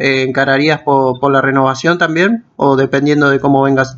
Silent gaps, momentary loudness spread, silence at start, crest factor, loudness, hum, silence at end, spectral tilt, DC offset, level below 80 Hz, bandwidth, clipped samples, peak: none; 2 LU; 0 s; 12 dB; -12 LUFS; none; 0 s; -6 dB/octave; under 0.1%; -52 dBFS; 7.8 kHz; under 0.1%; 0 dBFS